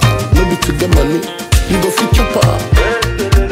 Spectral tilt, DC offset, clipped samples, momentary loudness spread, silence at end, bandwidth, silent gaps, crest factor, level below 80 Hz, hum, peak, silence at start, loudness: -5 dB/octave; under 0.1%; under 0.1%; 4 LU; 0 s; 16.5 kHz; none; 12 dB; -16 dBFS; none; 0 dBFS; 0 s; -13 LUFS